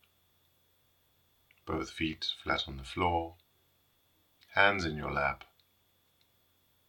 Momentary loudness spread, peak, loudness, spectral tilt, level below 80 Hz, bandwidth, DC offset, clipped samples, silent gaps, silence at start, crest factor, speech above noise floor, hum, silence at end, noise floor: 12 LU; -8 dBFS; -32 LUFS; -4.5 dB/octave; -56 dBFS; 18 kHz; under 0.1%; under 0.1%; none; 1.65 s; 28 dB; 39 dB; none; 1.5 s; -71 dBFS